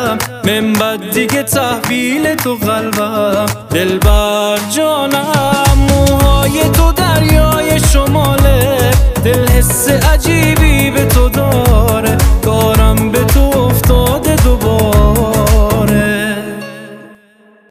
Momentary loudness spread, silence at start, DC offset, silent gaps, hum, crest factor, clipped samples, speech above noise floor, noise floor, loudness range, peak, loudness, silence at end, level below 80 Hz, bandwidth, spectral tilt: 5 LU; 0 s; under 0.1%; none; none; 10 dB; under 0.1%; 35 dB; -46 dBFS; 3 LU; 0 dBFS; -11 LUFS; 0.65 s; -14 dBFS; 16 kHz; -5 dB/octave